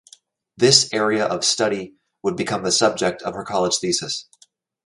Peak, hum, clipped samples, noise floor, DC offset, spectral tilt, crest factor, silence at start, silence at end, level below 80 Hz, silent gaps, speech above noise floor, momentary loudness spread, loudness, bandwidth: 0 dBFS; none; under 0.1%; -57 dBFS; under 0.1%; -2.5 dB/octave; 22 dB; 0.6 s; 0.65 s; -60 dBFS; none; 37 dB; 14 LU; -19 LUFS; 11.5 kHz